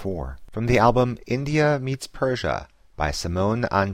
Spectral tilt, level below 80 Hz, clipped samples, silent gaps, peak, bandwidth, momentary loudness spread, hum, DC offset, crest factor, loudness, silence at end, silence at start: -6 dB/octave; -38 dBFS; under 0.1%; none; -4 dBFS; 15.5 kHz; 12 LU; none; under 0.1%; 18 dB; -23 LUFS; 0 s; 0 s